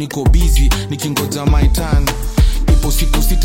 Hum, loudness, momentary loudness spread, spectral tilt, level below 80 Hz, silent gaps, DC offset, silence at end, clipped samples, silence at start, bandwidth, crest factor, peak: none; -15 LUFS; 4 LU; -5 dB/octave; -14 dBFS; none; under 0.1%; 0 s; under 0.1%; 0 s; 17 kHz; 12 dB; 0 dBFS